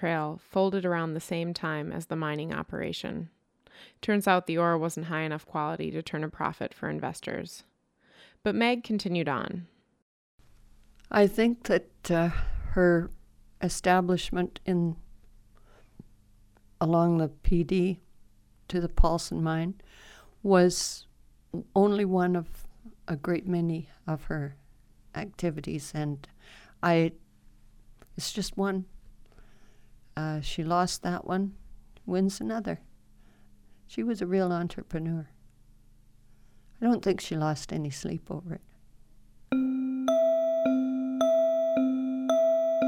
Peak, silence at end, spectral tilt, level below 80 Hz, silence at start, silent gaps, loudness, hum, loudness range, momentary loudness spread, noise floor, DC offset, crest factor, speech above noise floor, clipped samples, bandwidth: -8 dBFS; 0 s; -6 dB/octave; -42 dBFS; 0 s; 10.02-10.38 s; -29 LUFS; none; 6 LU; 13 LU; -65 dBFS; under 0.1%; 22 dB; 37 dB; under 0.1%; 16 kHz